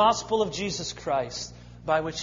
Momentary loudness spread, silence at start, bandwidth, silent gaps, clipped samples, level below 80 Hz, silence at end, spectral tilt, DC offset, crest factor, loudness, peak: 11 LU; 0 s; 7.6 kHz; none; under 0.1%; -52 dBFS; 0 s; -3.5 dB/octave; under 0.1%; 18 dB; -28 LUFS; -10 dBFS